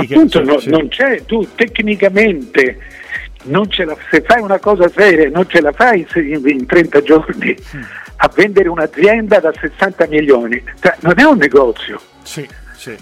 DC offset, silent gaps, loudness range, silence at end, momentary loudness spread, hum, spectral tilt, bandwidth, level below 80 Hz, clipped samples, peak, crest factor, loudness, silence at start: under 0.1%; none; 3 LU; 0.05 s; 16 LU; none; -6 dB/octave; 14 kHz; -38 dBFS; under 0.1%; 0 dBFS; 12 dB; -11 LUFS; 0 s